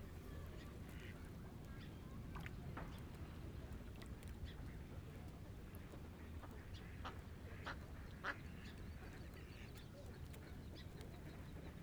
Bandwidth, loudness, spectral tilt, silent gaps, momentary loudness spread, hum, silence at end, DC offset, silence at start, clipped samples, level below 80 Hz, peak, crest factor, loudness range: over 20 kHz; -54 LUFS; -6 dB/octave; none; 4 LU; none; 0 s; under 0.1%; 0 s; under 0.1%; -58 dBFS; -30 dBFS; 22 dB; 2 LU